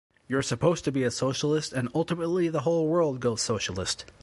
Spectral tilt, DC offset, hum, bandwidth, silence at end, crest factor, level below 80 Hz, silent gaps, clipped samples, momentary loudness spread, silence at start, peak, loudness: -5 dB/octave; under 0.1%; none; 11.5 kHz; 0.1 s; 18 dB; -54 dBFS; none; under 0.1%; 4 LU; 0.3 s; -10 dBFS; -27 LUFS